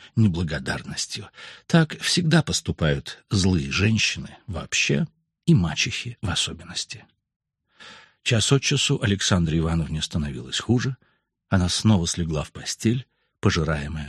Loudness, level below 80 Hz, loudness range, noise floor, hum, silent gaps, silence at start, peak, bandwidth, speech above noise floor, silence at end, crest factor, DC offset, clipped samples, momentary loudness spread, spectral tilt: -23 LUFS; -42 dBFS; 3 LU; -50 dBFS; none; 7.36-7.40 s; 0 s; -4 dBFS; 12.5 kHz; 27 dB; 0 s; 20 dB; under 0.1%; under 0.1%; 11 LU; -4.5 dB/octave